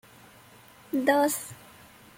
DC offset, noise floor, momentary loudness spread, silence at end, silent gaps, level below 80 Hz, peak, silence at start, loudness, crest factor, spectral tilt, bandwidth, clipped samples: under 0.1%; -53 dBFS; 20 LU; 0.65 s; none; -70 dBFS; -10 dBFS; 0.95 s; -26 LUFS; 20 dB; -3 dB/octave; 16.5 kHz; under 0.1%